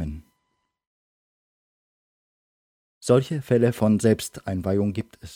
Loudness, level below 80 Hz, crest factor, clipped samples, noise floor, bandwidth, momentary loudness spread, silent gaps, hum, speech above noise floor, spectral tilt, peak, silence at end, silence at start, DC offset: -23 LUFS; -50 dBFS; 20 dB; under 0.1%; -76 dBFS; 17.5 kHz; 14 LU; 0.87-3.01 s; none; 54 dB; -6.5 dB/octave; -6 dBFS; 0 s; 0 s; under 0.1%